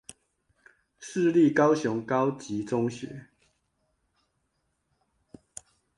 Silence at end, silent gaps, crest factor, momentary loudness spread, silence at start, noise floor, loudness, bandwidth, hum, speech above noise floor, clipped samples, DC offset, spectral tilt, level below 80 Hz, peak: 2.75 s; none; 20 dB; 25 LU; 1 s; -76 dBFS; -26 LUFS; 11.5 kHz; none; 51 dB; under 0.1%; under 0.1%; -6.5 dB/octave; -70 dBFS; -10 dBFS